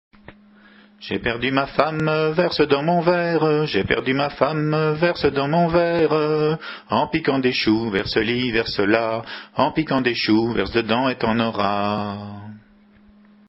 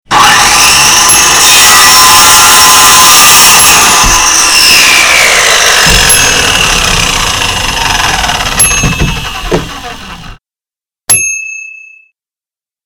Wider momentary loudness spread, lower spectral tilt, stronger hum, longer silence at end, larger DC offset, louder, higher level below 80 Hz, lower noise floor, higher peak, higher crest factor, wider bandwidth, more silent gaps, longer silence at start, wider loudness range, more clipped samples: second, 6 LU vs 14 LU; first, -8 dB/octave vs 0 dB/octave; neither; second, 0.9 s vs 1.1 s; neither; second, -20 LUFS vs -2 LUFS; second, -48 dBFS vs -22 dBFS; second, -52 dBFS vs under -90 dBFS; about the same, 0 dBFS vs 0 dBFS; first, 20 dB vs 6 dB; second, 7.8 kHz vs over 20 kHz; neither; first, 0.3 s vs 0.1 s; second, 2 LU vs 12 LU; second, under 0.1% vs 5%